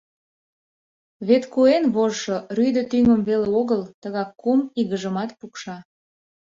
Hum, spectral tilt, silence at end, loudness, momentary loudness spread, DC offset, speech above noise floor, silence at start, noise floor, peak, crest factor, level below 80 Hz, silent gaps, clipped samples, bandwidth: none; -6 dB/octave; 0.7 s; -21 LUFS; 15 LU; under 0.1%; over 69 dB; 1.2 s; under -90 dBFS; -4 dBFS; 18 dB; -58 dBFS; 3.94-4.02 s; under 0.1%; 7.6 kHz